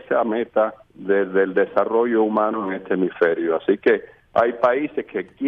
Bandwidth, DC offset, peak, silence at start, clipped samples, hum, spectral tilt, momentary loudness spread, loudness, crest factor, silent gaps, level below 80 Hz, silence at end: 5.2 kHz; under 0.1%; -4 dBFS; 0.1 s; under 0.1%; none; -8.5 dB/octave; 6 LU; -21 LUFS; 16 dB; none; -62 dBFS; 0 s